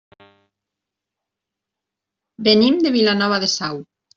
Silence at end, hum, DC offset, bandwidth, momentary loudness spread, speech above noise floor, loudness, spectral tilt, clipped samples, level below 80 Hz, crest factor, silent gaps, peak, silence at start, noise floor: 0.35 s; none; under 0.1%; 7.8 kHz; 11 LU; 67 dB; -17 LUFS; -4 dB/octave; under 0.1%; -62 dBFS; 18 dB; none; -2 dBFS; 2.4 s; -84 dBFS